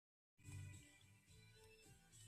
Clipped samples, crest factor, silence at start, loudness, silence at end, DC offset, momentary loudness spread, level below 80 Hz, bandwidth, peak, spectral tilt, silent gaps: under 0.1%; 16 dB; 0.4 s; -63 LUFS; 0 s; under 0.1%; 11 LU; -78 dBFS; 14 kHz; -46 dBFS; -4 dB/octave; none